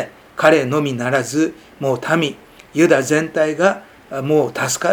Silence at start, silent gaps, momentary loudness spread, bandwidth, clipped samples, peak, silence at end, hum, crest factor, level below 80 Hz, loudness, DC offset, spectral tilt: 0 s; none; 12 LU; 20 kHz; under 0.1%; 0 dBFS; 0 s; none; 18 dB; -58 dBFS; -17 LUFS; under 0.1%; -4.5 dB/octave